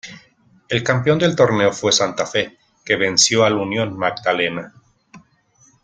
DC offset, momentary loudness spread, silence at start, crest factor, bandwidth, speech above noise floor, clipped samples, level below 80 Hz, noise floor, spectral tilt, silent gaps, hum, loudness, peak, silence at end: under 0.1%; 9 LU; 0.05 s; 18 dB; 10 kHz; 38 dB; under 0.1%; -56 dBFS; -56 dBFS; -3.5 dB/octave; none; none; -17 LUFS; -2 dBFS; 0.65 s